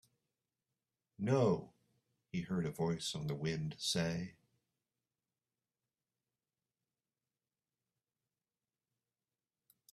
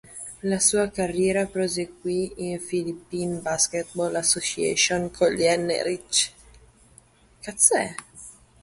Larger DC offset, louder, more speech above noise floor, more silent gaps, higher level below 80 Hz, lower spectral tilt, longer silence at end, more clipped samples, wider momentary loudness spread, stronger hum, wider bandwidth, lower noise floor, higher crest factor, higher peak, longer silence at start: neither; second, -38 LUFS vs -23 LUFS; first, over 53 dB vs 31 dB; neither; second, -72 dBFS vs -54 dBFS; first, -5.5 dB/octave vs -2.5 dB/octave; first, 5.6 s vs 0.3 s; neither; about the same, 11 LU vs 12 LU; neither; first, 13.5 kHz vs 12 kHz; first, under -90 dBFS vs -55 dBFS; about the same, 24 dB vs 22 dB; second, -20 dBFS vs -4 dBFS; first, 1.2 s vs 0.1 s